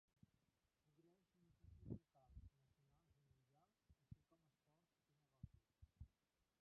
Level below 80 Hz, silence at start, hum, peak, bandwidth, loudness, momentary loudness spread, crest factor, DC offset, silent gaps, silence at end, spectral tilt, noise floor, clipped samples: -74 dBFS; 0.85 s; none; -38 dBFS; 3.5 kHz; -64 LUFS; 11 LU; 28 dB; under 0.1%; none; 0.55 s; -11 dB/octave; under -90 dBFS; under 0.1%